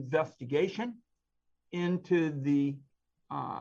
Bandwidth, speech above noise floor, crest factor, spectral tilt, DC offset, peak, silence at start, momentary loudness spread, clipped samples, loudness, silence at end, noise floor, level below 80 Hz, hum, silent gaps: 7.4 kHz; 47 dB; 18 dB; -7.5 dB/octave; under 0.1%; -16 dBFS; 0 s; 12 LU; under 0.1%; -32 LUFS; 0 s; -78 dBFS; -78 dBFS; 60 Hz at -65 dBFS; none